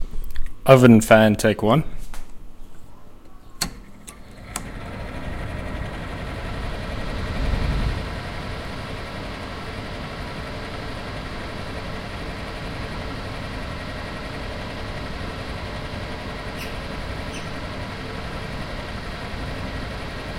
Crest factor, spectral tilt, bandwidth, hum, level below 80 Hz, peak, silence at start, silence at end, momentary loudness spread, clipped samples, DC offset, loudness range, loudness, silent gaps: 24 dB; -6 dB/octave; 16.5 kHz; none; -34 dBFS; 0 dBFS; 0 s; 0 s; 14 LU; under 0.1%; under 0.1%; 12 LU; -25 LUFS; none